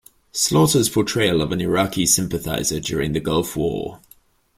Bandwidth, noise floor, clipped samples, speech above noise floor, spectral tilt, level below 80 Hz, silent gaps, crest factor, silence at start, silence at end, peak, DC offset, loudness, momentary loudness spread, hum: 16.5 kHz; -54 dBFS; under 0.1%; 34 dB; -4 dB/octave; -44 dBFS; none; 18 dB; 0.35 s; 0.6 s; -4 dBFS; under 0.1%; -20 LUFS; 8 LU; none